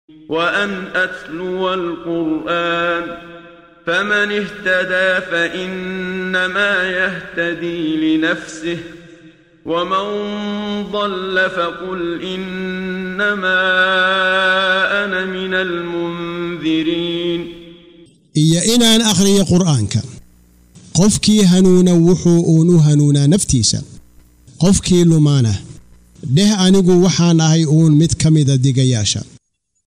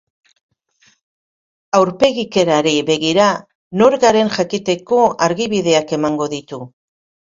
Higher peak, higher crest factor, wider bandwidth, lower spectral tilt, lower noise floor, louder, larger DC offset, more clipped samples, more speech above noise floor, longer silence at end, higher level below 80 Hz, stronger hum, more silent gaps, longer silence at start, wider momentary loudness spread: about the same, -2 dBFS vs 0 dBFS; about the same, 12 dB vs 16 dB; first, 15.5 kHz vs 7.8 kHz; about the same, -5 dB/octave vs -4.5 dB/octave; about the same, -57 dBFS vs -57 dBFS; about the same, -15 LUFS vs -15 LUFS; neither; neither; about the same, 43 dB vs 42 dB; about the same, 0.6 s vs 0.6 s; first, -42 dBFS vs -56 dBFS; neither; second, none vs 3.55-3.71 s; second, 0.3 s vs 1.75 s; about the same, 12 LU vs 10 LU